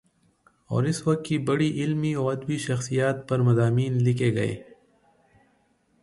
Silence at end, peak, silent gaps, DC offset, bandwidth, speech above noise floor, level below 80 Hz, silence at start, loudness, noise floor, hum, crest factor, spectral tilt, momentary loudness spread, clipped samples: 1.4 s; -10 dBFS; none; under 0.1%; 11.5 kHz; 42 dB; -60 dBFS; 0.7 s; -25 LUFS; -66 dBFS; none; 16 dB; -7 dB/octave; 6 LU; under 0.1%